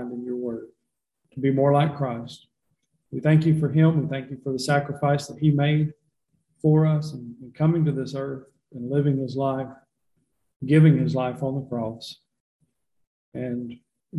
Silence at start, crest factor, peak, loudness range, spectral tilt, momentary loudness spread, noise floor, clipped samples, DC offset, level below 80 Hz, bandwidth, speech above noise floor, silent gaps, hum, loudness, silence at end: 0 s; 18 dB; -6 dBFS; 4 LU; -8 dB/octave; 18 LU; -81 dBFS; under 0.1%; under 0.1%; -60 dBFS; 11.5 kHz; 58 dB; 10.56-10.60 s, 12.40-12.59 s, 13.07-13.32 s; none; -23 LUFS; 0 s